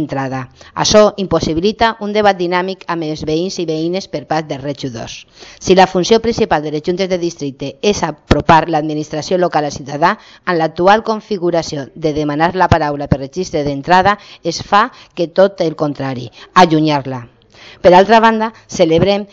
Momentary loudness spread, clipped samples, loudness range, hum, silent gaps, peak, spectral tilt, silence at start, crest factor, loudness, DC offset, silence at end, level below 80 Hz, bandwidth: 12 LU; 0.1%; 4 LU; none; none; 0 dBFS; -5 dB/octave; 0 s; 14 dB; -14 LUFS; under 0.1%; 0.05 s; -36 dBFS; 8 kHz